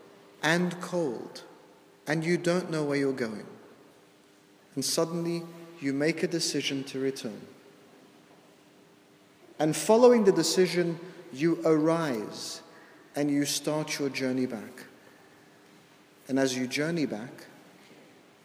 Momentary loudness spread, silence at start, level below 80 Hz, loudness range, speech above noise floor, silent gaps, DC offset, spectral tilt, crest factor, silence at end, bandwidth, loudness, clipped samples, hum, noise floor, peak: 17 LU; 0.4 s; -82 dBFS; 9 LU; 31 dB; none; under 0.1%; -4.5 dB/octave; 22 dB; 0.95 s; 16 kHz; -28 LUFS; under 0.1%; none; -59 dBFS; -8 dBFS